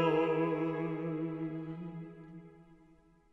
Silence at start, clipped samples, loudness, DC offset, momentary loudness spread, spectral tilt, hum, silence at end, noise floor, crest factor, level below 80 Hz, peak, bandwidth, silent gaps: 0 s; under 0.1%; -35 LUFS; under 0.1%; 20 LU; -9 dB/octave; none; 0.55 s; -64 dBFS; 20 dB; -70 dBFS; -16 dBFS; 6 kHz; none